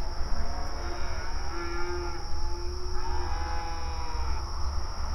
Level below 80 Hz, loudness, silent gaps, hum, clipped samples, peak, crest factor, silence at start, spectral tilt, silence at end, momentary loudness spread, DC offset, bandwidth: -32 dBFS; -35 LUFS; none; none; under 0.1%; -14 dBFS; 14 dB; 0 s; -5 dB/octave; 0 s; 2 LU; under 0.1%; 11 kHz